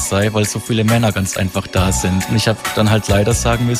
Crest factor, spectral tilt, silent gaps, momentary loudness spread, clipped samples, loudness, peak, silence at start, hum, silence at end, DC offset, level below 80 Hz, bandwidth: 12 dB; -5 dB/octave; none; 4 LU; under 0.1%; -16 LUFS; -2 dBFS; 0 s; none; 0 s; under 0.1%; -30 dBFS; 16 kHz